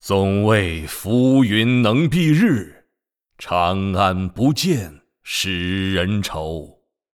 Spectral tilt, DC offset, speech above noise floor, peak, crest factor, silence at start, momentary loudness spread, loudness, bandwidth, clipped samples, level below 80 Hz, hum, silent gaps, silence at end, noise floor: -6 dB/octave; under 0.1%; 59 dB; -4 dBFS; 14 dB; 0.05 s; 11 LU; -18 LUFS; 17.5 kHz; under 0.1%; -44 dBFS; none; none; 0.5 s; -77 dBFS